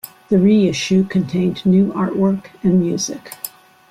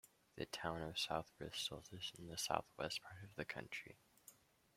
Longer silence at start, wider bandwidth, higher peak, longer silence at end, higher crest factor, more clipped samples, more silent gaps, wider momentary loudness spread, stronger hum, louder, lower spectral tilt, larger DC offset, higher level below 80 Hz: about the same, 0.05 s vs 0.05 s; about the same, 16 kHz vs 16 kHz; first, -4 dBFS vs -22 dBFS; about the same, 0.4 s vs 0.45 s; second, 12 dB vs 28 dB; neither; neither; second, 13 LU vs 20 LU; neither; first, -17 LUFS vs -46 LUFS; first, -6 dB/octave vs -3 dB/octave; neither; first, -52 dBFS vs -72 dBFS